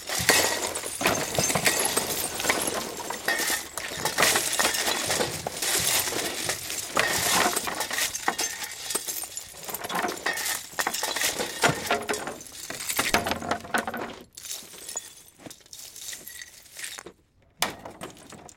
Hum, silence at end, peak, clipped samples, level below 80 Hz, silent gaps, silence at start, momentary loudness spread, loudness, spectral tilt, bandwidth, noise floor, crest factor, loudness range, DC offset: none; 0.1 s; -4 dBFS; under 0.1%; -58 dBFS; none; 0 s; 16 LU; -26 LUFS; -1 dB/octave; 17 kHz; -59 dBFS; 26 dB; 12 LU; under 0.1%